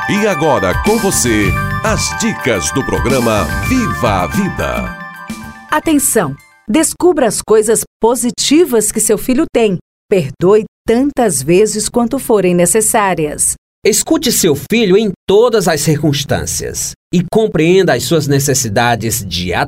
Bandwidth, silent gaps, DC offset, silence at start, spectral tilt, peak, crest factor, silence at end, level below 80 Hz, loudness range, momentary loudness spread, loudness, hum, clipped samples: 16.5 kHz; 7.87-8.00 s, 9.81-10.09 s, 10.68-10.85 s, 13.58-13.82 s, 15.16-15.27 s, 16.96-17.11 s; under 0.1%; 0 s; -4 dB/octave; 0 dBFS; 12 dB; 0 s; -32 dBFS; 3 LU; 6 LU; -13 LUFS; none; under 0.1%